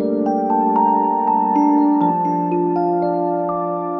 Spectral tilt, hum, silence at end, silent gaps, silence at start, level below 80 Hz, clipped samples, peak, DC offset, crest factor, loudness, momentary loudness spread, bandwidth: -10 dB/octave; none; 0 s; none; 0 s; -62 dBFS; under 0.1%; -4 dBFS; under 0.1%; 14 dB; -17 LUFS; 5 LU; 6 kHz